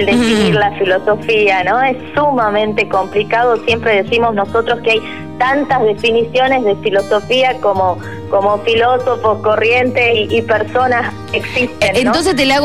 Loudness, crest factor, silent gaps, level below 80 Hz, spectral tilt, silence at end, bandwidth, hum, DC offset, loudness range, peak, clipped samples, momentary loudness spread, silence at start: -13 LUFS; 10 dB; none; -44 dBFS; -5 dB/octave; 0 s; 13.5 kHz; none; 1%; 1 LU; -2 dBFS; under 0.1%; 4 LU; 0 s